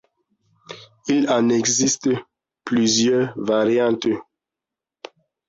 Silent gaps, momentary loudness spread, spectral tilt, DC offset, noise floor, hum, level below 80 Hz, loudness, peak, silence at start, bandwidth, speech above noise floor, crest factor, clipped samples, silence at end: none; 17 LU; -3.5 dB/octave; under 0.1%; -87 dBFS; none; -62 dBFS; -19 LUFS; -6 dBFS; 0.7 s; 7.8 kHz; 68 dB; 14 dB; under 0.1%; 1.25 s